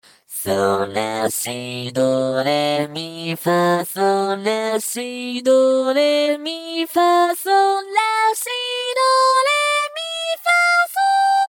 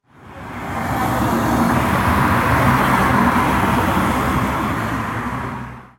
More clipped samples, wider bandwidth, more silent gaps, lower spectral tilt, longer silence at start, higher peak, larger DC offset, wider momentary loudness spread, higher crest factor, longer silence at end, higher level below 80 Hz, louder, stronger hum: neither; first, 20 kHz vs 17 kHz; neither; second, -3.5 dB/octave vs -6 dB/octave; about the same, 0.3 s vs 0.2 s; about the same, -4 dBFS vs -2 dBFS; neither; about the same, 10 LU vs 12 LU; about the same, 14 dB vs 16 dB; about the same, 0 s vs 0.1 s; second, -70 dBFS vs -32 dBFS; about the same, -18 LUFS vs -17 LUFS; neither